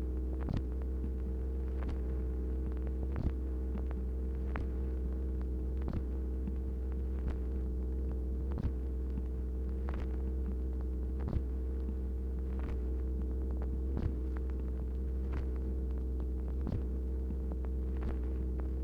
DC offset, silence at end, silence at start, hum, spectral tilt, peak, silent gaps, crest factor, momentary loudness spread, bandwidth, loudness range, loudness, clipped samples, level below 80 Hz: under 0.1%; 0 s; 0 s; none; -10 dB/octave; -20 dBFS; none; 14 dB; 1 LU; 3 kHz; 0 LU; -38 LUFS; under 0.1%; -36 dBFS